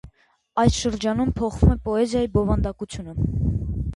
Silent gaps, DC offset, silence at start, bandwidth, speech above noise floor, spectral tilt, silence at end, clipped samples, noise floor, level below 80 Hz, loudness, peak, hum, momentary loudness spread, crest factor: none; under 0.1%; 0.05 s; 11.5 kHz; 36 dB; -6.5 dB/octave; 0 s; under 0.1%; -58 dBFS; -30 dBFS; -23 LUFS; -4 dBFS; none; 8 LU; 20 dB